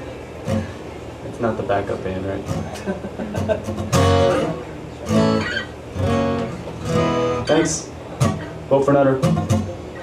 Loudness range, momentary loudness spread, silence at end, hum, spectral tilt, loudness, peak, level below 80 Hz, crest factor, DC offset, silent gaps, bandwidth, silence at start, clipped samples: 6 LU; 15 LU; 0 s; none; -6 dB/octave; -21 LUFS; -4 dBFS; -42 dBFS; 18 dB; under 0.1%; none; 15 kHz; 0 s; under 0.1%